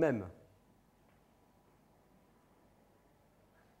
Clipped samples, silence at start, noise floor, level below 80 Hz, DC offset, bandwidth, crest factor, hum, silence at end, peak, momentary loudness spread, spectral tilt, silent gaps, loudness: under 0.1%; 0 s; -68 dBFS; -74 dBFS; under 0.1%; 15.5 kHz; 26 dB; 50 Hz at -75 dBFS; 3.5 s; -18 dBFS; 24 LU; -8 dB/octave; none; -38 LUFS